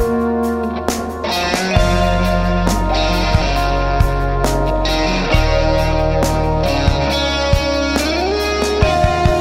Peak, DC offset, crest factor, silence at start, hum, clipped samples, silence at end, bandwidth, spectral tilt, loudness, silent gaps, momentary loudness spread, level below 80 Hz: 0 dBFS; under 0.1%; 14 dB; 0 s; none; under 0.1%; 0 s; 16 kHz; -5.5 dB/octave; -16 LUFS; none; 3 LU; -20 dBFS